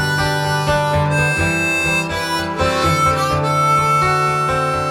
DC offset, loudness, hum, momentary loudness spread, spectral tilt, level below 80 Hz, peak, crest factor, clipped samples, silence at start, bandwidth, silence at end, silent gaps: under 0.1%; -16 LUFS; none; 4 LU; -4.5 dB/octave; -38 dBFS; -4 dBFS; 14 dB; under 0.1%; 0 s; 17 kHz; 0 s; none